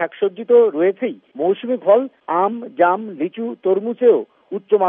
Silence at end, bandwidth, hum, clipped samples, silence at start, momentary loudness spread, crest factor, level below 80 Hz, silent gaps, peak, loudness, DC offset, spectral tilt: 0 s; 3.7 kHz; none; under 0.1%; 0 s; 11 LU; 16 dB; -80 dBFS; none; -2 dBFS; -18 LUFS; under 0.1%; -4.5 dB/octave